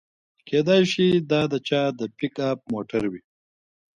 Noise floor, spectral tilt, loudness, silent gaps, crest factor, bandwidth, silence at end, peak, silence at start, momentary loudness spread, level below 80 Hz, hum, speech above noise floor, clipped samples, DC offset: under -90 dBFS; -6 dB/octave; -23 LUFS; none; 18 dB; 10.5 kHz; 0.8 s; -6 dBFS; 0.45 s; 10 LU; -60 dBFS; none; over 68 dB; under 0.1%; under 0.1%